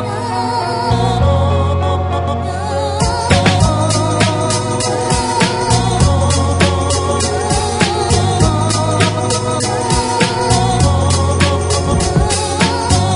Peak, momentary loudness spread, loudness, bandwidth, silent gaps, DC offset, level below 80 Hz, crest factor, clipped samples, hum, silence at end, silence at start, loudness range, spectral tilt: 0 dBFS; 4 LU; -14 LUFS; 11 kHz; none; 0.2%; -26 dBFS; 14 dB; under 0.1%; none; 0 s; 0 s; 1 LU; -4.5 dB/octave